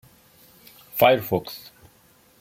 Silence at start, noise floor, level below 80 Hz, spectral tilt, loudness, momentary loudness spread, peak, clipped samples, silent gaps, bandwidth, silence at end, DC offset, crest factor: 0.95 s; -57 dBFS; -62 dBFS; -5 dB/octave; -21 LUFS; 20 LU; -2 dBFS; under 0.1%; none; 16.5 kHz; 0.8 s; under 0.1%; 22 dB